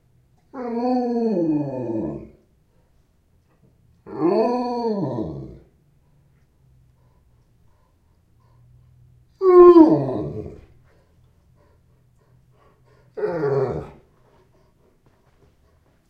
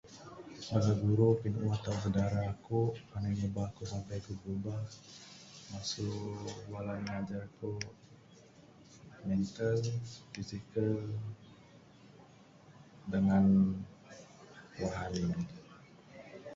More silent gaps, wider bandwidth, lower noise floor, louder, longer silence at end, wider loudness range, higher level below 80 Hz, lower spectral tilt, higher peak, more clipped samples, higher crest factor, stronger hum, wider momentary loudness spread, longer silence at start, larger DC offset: neither; second, 5 kHz vs 7.8 kHz; about the same, -61 dBFS vs -59 dBFS; first, -19 LUFS vs -35 LUFS; first, 2.2 s vs 0 s; first, 14 LU vs 8 LU; about the same, -54 dBFS vs -58 dBFS; first, -9.5 dB/octave vs -7 dB/octave; first, 0 dBFS vs -16 dBFS; neither; about the same, 22 dB vs 20 dB; neither; first, 27 LU vs 22 LU; first, 0.55 s vs 0.05 s; neither